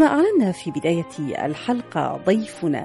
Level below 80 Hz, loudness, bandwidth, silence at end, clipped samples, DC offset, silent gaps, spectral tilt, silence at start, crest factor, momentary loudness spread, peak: -62 dBFS; -22 LUFS; 11.5 kHz; 0 s; under 0.1%; under 0.1%; none; -6.5 dB/octave; 0 s; 16 dB; 8 LU; -6 dBFS